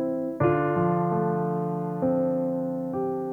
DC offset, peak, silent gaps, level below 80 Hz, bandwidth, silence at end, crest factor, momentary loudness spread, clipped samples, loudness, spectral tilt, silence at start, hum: under 0.1%; -10 dBFS; none; -58 dBFS; 3.2 kHz; 0 s; 14 dB; 5 LU; under 0.1%; -26 LUFS; -10.5 dB/octave; 0 s; none